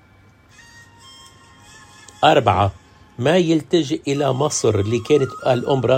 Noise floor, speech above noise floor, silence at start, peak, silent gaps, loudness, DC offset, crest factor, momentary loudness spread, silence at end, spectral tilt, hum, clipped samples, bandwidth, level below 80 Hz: -51 dBFS; 34 dB; 2.2 s; 0 dBFS; none; -18 LUFS; under 0.1%; 18 dB; 5 LU; 0 s; -5.5 dB/octave; none; under 0.1%; 16 kHz; -54 dBFS